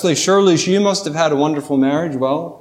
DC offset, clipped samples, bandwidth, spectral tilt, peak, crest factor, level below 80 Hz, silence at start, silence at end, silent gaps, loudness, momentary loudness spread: under 0.1%; under 0.1%; 14.5 kHz; -4.5 dB/octave; -2 dBFS; 14 dB; -64 dBFS; 0 s; 0.05 s; none; -16 LUFS; 6 LU